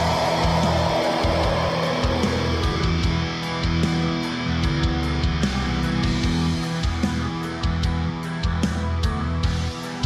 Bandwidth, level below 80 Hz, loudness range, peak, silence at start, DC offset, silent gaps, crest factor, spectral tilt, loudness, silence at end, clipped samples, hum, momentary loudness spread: 13.5 kHz; -30 dBFS; 3 LU; -10 dBFS; 0 s; under 0.1%; none; 12 dB; -6 dB/octave; -23 LUFS; 0 s; under 0.1%; none; 5 LU